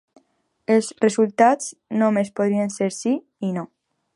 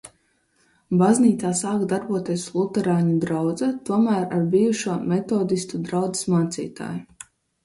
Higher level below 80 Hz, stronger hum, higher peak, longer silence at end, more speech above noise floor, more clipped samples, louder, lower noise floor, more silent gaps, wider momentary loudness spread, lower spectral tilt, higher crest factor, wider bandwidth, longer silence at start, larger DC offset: second, -72 dBFS vs -62 dBFS; neither; first, -2 dBFS vs -6 dBFS; about the same, 0.5 s vs 0.6 s; about the same, 42 dB vs 44 dB; neither; about the same, -21 LUFS vs -22 LUFS; about the same, -62 dBFS vs -65 dBFS; neither; about the same, 10 LU vs 8 LU; about the same, -5.5 dB/octave vs -6 dB/octave; about the same, 20 dB vs 16 dB; about the same, 11.5 kHz vs 11.5 kHz; first, 0.7 s vs 0.05 s; neither